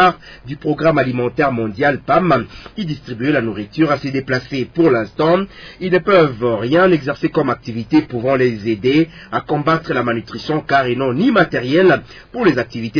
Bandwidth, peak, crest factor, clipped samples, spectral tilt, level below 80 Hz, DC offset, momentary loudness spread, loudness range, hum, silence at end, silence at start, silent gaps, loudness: 5.4 kHz; 0 dBFS; 16 dB; under 0.1%; -7.5 dB/octave; -46 dBFS; under 0.1%; 10 LU; 2 LU; none; 0 s; 0 s; none; -16 LUFS